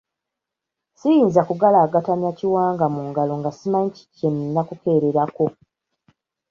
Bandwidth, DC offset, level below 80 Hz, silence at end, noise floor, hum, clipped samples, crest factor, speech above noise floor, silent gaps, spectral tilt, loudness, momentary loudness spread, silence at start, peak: 7.2 kHz; under 0.1%; -64 dBFS; 1 s; -84 dBFS; none; under 0.1%; 18 dB; 65 dB; none; -9 dB/octave; -20 LUFS; 9 LU; 1.05 s; -2 dBFS